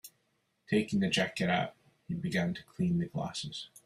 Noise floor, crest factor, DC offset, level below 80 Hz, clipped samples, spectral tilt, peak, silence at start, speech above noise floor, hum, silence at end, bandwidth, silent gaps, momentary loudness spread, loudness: -77 dBFS; 18 dB; under 0.1%; -66 dBFS; under 0.1%; -5.5 dB/octave; -14 dBFS; 0.05 s; 44 dB; none; 0.2 s; 15 kHz; none; 9 LU; -33 LUFS